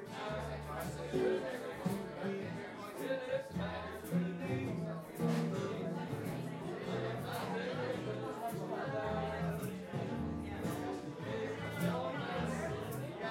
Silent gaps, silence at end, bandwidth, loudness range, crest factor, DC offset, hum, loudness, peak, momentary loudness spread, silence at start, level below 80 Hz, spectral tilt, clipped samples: none; 0 s; 16.5 kHz; 1 LU; 16 dB; under 0.1%; none; -40 LUFS; -22 dBFS; 6 LU; 0 s; -62 dBFS; -6.5 dB/octave; under 0.1%